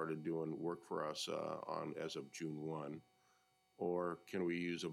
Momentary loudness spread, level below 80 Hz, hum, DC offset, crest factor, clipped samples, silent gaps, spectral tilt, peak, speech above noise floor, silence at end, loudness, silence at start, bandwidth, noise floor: 6 LU; -84 dBFS; none; under 0.1%; 16 dB; under 0.1%; none; -5 dB/octave; -28 dBFS; 33 dB; 0 s; -44 LUFS; 0 s; 15.5 kHz; -77 dBFS